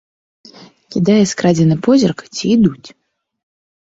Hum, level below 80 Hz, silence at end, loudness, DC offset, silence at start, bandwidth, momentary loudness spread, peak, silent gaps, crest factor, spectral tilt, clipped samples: none; -50 dBFS; 1 s; -14 LUFS; under 0.1%; 0.9 s; 8 kHz; 6 LU; -2 dBFS; none; 14 dB; -6 dB/octave; under 0.1%